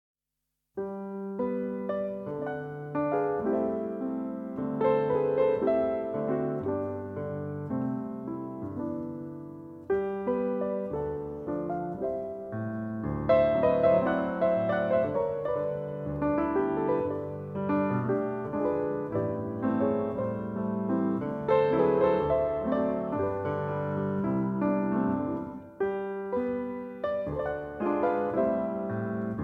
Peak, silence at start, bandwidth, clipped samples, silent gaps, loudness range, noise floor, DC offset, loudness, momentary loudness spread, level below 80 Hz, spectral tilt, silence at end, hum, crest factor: -12 dBFS; 0.75 s; 5 kHz; under 0.1%; none; 6 LU; -85 dBFS; under 0.1%; -30 LUFS; 11 LU; -56 dBFS; -10 dB/octave; 0 s; none; 16 dB